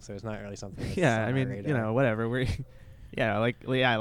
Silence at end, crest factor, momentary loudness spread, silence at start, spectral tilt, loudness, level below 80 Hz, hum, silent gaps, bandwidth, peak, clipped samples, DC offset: 0 s; 18 dB; 13 LU; 0 s; -6.5 dB/octave; -29 LUFS; -48 dBFS; none; none; 12 kHz; -10 dBFS; under 0.1%; under 0.1%